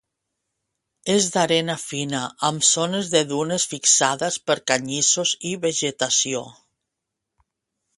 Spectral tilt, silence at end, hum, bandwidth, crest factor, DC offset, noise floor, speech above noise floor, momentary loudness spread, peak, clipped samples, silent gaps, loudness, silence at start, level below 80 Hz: -2 dB/octave; 1.45 s; none; 11.5 kHz; 20 dB; under 0.1%; -82 dBFS; 60 dB; 9 LU; -2 dBFS; under 0.1%; none; -20 LUFS; 1.05 s; -66 dBFS